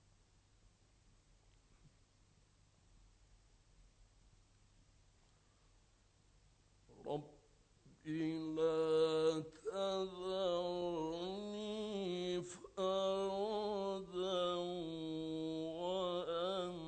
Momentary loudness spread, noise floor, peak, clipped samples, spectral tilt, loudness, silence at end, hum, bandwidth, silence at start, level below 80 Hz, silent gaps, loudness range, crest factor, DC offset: 9 LU; -71 dBFS; -24 dBFS; under 0.1%; -5.5 dB/octave; -40 LUFS; 0 s; none; 8.8 kHz; 1.85 s; -72 dBFS; none; 14 LU; 18 dB; under 0.1%